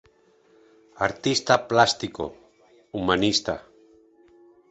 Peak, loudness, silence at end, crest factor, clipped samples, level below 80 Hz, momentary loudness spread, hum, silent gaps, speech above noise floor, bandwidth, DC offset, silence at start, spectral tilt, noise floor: -2 dBFS; -23 LUFS; 1.1 s; 24 dB; under 0.1%; -54 dBFS; 15 LU; none; none; 37 dB; 8.2 kHz; under 0.1%; 1 s; -3.5 dB/octave; -60 dBFS